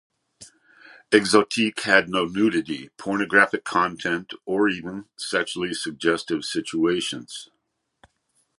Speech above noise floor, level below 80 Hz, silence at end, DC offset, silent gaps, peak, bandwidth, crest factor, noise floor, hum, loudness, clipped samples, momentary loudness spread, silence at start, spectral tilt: 47 dB; -62 dBFS; 1.15 s; under 0.1%; none; -2 dBFS; 11.5 kHz; 22 dB; -70 dBFS; none; -23 LUFS; under 0.1%; 13 LU; 0.4 s; -3.5 dB/octave